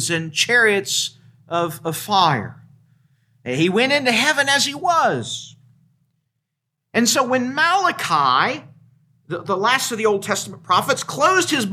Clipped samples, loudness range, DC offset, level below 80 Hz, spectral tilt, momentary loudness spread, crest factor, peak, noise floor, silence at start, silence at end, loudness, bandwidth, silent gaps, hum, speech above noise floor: under 0.1%; 2 LU; under 0.1%; -68 dBFS; -2.5 dB/octave; 11 LU; 18 dB; -2 dBFS; -78 dBFS; 0 s; 0 s; -18 LUFS; 16 kHz; none; none; 60 dB